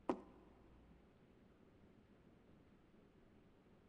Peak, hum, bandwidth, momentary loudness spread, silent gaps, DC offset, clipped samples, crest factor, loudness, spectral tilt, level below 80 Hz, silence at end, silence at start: -22 dBFS; none; 5.4 kHz; 11 LU; none; under 0.1%; under 0.1%; 34 dB; -60 LUFS; -6 dB/octave; -76 dBFS; 0 s; 0 s